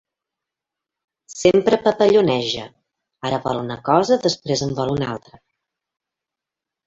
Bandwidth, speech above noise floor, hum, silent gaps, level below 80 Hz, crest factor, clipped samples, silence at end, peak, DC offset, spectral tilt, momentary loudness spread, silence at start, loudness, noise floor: 8 kHz; 68 dB; none; none; -54 dBFS; 20 dB; under 0.1%; 1.7 s; -2 dBFS; under 0.1%; -5 dB/octave; 13 LU; 1.3 s; -19 LUFS; -86 dBFS